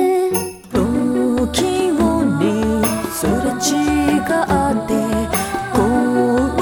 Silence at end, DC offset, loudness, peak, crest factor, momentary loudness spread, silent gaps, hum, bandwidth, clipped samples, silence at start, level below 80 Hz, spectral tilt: 0 s; under 0.1%; -17 LUFS; -4 dBFS; 14 dB; 4 LU; none; none; over 20 kHz; under 0.1%; 0 s; -34 dBFS; -5 dB/octave